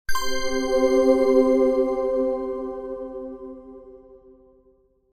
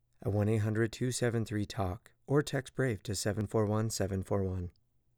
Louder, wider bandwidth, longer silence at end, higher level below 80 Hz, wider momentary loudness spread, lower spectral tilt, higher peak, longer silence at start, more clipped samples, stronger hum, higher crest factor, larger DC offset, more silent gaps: first, -22 LUFS vs -33 LUFS; second, 15 kHz vs 18.5 kHz; first, 0.95 s vs 0.45 s; first, -44 dBFS vs -62 dBFS; first, 18 LU vs 6 LU; second, -4 dB/octave vs -6 dB/octave; first, -6 dBFS vs -18 dBFS; second, 0.1 s vs 0.25 s; neither; neither; about the same, 18 dB vs 16 dB; neither; neither